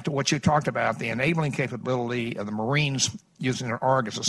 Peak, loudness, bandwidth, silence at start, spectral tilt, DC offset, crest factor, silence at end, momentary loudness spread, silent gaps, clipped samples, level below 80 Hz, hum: -6 dBFS; -26 LUFS; 12.5 kHz; 0 s; -4.5 dB/octave; under 0.1%; 20 dB; 0 s; 7 LU; none; under 0.1%; -54 dBFS; none